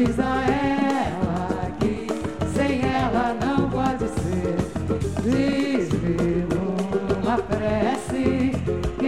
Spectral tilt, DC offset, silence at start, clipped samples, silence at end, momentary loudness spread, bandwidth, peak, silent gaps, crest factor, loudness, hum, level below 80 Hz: -7 dB/octave; 0.6%; 0 s; under 0.1%; 0 s; 4 LU; 13 kHz; -6 dBFS; none; 16 dB; -23 LUFS; none; -38 dBFS